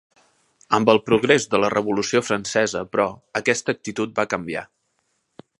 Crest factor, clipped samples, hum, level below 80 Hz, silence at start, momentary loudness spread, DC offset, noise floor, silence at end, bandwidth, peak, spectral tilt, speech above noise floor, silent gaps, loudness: 22 dB; under 0.1%; none; -58 dBFS; 0.7 s; 9 LU; under 0.1%; -71 dBFS; 0.95 s; 11.5 kHz; 0 dBFS; -4 dB/octave; 50 dB; none; -21 LUFS